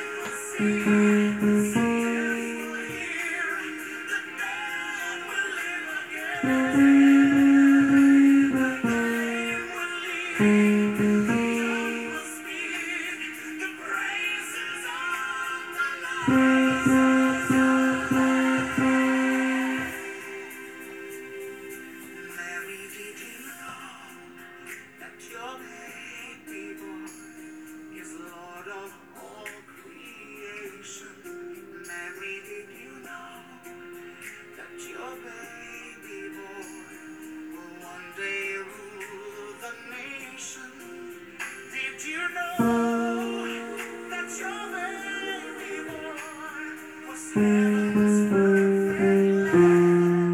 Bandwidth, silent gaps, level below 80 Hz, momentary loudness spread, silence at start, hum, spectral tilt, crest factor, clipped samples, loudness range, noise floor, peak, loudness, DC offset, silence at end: 15.5 kHz; none; -62 dBFS; 22 LU; 0 s; none; -5.5 dB/octave; 18 dB; under 0.1%; 20 LU; -47 dBFS; -8 dBFS; -24 LUFS; under 0.1%; 0 s